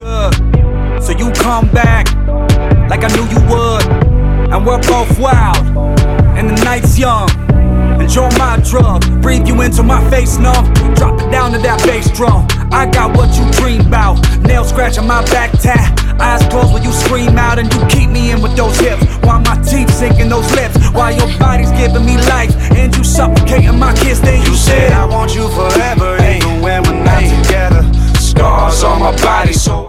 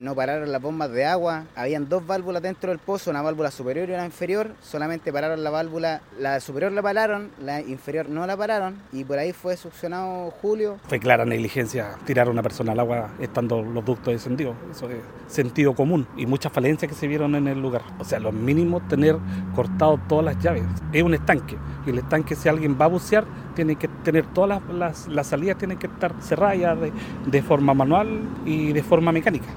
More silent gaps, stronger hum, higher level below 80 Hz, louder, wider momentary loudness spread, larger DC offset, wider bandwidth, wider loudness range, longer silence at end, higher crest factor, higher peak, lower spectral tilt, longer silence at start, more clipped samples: neither; neither; first, -12 dBFS vs -48 dBFS; first, -10 LUFS vs -24 LUFS; second, 3 LU vs 10 LU; neither; second, 15.5 kHz vs 17.5 kHz; second, 1 LU vs 5 LU; about the same, 0 s vs 0 s; second, 8 dB vs 22 dB; about the same, 0 dBFS vs 0 dBFS; second, -5.5 dB/octave vs -7 dB/octave; about the same, 0 s vs 0 s; neither